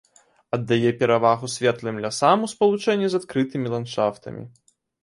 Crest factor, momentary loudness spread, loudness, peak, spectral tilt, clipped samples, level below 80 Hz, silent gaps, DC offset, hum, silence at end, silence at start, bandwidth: 20 dB; 10 LU; -22 LUFS; -2 dBFS; -5.5 dB/octave; under 0.1%; -62 dBFS; none; under 0.1%; none; 0.55 s; 0.55 s; 11.5 kHz